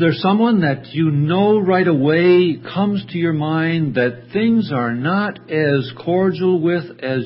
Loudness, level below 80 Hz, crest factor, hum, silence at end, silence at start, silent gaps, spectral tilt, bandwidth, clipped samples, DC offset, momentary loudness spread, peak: -17 LUFS; -60 dBFS; 14 dB; none; 0 s; 0 s; none; -12.5 dB/octave; 5.8 kHz; under 0.1%; under 0.1%; 6 LU; -2 dBFS